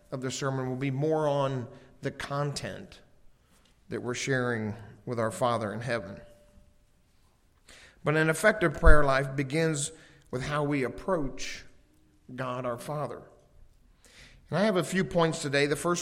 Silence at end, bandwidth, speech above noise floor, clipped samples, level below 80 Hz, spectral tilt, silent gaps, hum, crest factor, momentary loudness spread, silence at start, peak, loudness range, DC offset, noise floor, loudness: 0 s; 13.5 kHz; 37 dB; under 0.1%; -36 dBFS; -5 dB/octave; none; none; 26 dB; 15 LU; 0.1 s; -2 dBFS; 8 LU; under 0.1%; -64 dBFS; -29 LUFS